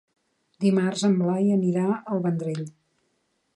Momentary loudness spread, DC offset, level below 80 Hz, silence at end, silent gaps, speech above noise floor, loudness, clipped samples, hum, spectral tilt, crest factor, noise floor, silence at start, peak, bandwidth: 9 LU; under 0.1%; -74 dBFS; 0.85 s; none; 49 dB; -24 LUFS; under 0.1%; none; -7 dB/octave; 14 dB; -72 dBFS; 0.6 s; -10 dBFS; 11 kHz